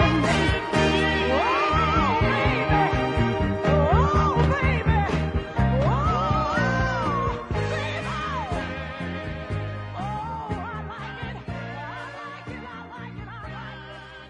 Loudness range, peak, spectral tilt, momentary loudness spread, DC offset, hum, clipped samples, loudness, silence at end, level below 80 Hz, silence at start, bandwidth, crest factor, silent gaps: 12 LU; -6 dBFS; -6.5 dB/octave; 16 LU; under 0.1%; none; under 0.1%; -24 LUFS; 0 s; -34 dBFS; 0 s; 10.5 kHz; 18 dB; none